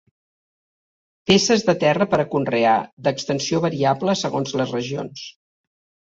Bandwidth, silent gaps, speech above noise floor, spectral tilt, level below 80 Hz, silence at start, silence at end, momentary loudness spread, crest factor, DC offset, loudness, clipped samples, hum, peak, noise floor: 7.8 kHz; 2.93-2.97 s; over 70 dB; -4.5 dB/octave; -58 dBFS; 1.25 s; 0.8 s; 12 LU; 18 dB; under 0.1%; -20 LUFS; under 0.1%; none; -2 dBFS; under -90 dBFS